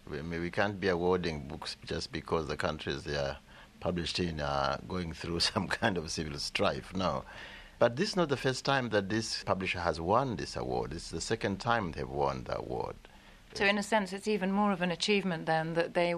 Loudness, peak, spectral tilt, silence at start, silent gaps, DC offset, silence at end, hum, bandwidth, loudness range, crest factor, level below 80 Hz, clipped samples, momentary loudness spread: -32 LUFS; -12 dBFS; -4.5 dB/octave; 0.05 s; none; under 0.1%; 0 s; none; 13.5 kHz; 4 LU; 20 dB; -52 dBFS; under 0.1%; 9 LU